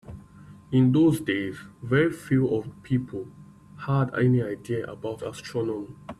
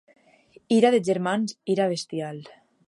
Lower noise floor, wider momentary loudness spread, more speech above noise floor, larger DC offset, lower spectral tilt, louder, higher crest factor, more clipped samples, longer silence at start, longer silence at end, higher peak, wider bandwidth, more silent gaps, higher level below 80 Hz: second, -48 dBFS vs -56 dBFS; about the same, 16 LU vs 14 LU; second, 23 dB vs 33 dB; neither; first, -7.5 dB/octave vs -5.5 dB/octave; about the same, -26 LUFS vs -24 LUFS; about the same, 16 dB vs 20 dB; neither; second, 0.05 s vs 0.7 s; second, 0.05 s vs 0.4 s; second, -10 dBFS vs -6 dBFS; about the same, 12.5 kHz vs 11.5 kHz; neither; first, -56 dBFS vs -76 dBFS